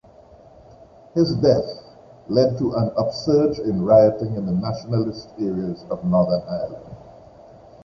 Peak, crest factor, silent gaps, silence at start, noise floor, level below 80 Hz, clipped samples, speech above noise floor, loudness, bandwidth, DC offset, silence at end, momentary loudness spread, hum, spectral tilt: -2 dBFS; 18 dB; none; 1.15 s; -48 dBFS; -50 dBFS; under 0.1%; 28 dB; -21 LUFS; 7.2 kHz; under 0.1%; 0.75 s; 13 LU; none; -8.5 dB/octave